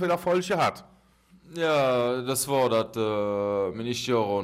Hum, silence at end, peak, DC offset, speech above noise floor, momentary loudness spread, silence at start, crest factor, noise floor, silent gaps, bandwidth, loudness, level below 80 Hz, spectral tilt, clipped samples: none; 0 s; -12 dBFS; under 0.1%; 33 dB; 5 LU; 0 s; 14 dB; -58 dBFS; none; 16 kHz; -26 LUFS; -64 dBFS; -4.5 dB/octave; under 0.1%